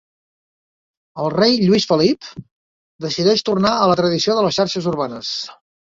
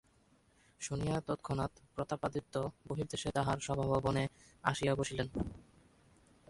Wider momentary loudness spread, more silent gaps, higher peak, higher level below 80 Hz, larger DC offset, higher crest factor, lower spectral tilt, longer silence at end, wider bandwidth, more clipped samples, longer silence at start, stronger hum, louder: first, 12 LU vs 8 LU; first, 2.51-2.99 s vs none; first, -2 dBFS vs -14 dBFS; about the same, -56 dBFS vs -56 dBFS; neither; second, 18 dB vs 24 dB; about the same, -5 dB/octave vs -5.5 dB/octave; second, 0.3 s vs 0.9 s; second, 7.8 kHz vs 11.5 kHz; neither; first, 1.15 s vs 0.8 s; neither; first, -17 LUFS vs -37 LUFS